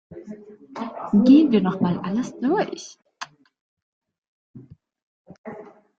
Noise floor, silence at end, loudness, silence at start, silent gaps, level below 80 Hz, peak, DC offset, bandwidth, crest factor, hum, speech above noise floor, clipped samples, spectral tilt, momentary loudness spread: -41 dBFS; 0.35 s; -20 LUFS; 0.1 s; 3.61-3.77 s, 3.83-4.01 s, 4.18-4.54 s, 5.02-5.25 s, 5.38-5.44 s; -62 dBFS; -4 dBFS; under 0.1%; 7.6 kHz; 20 dB; none; 21 dB; under 0.1%; -7 dB/octave; 26 LU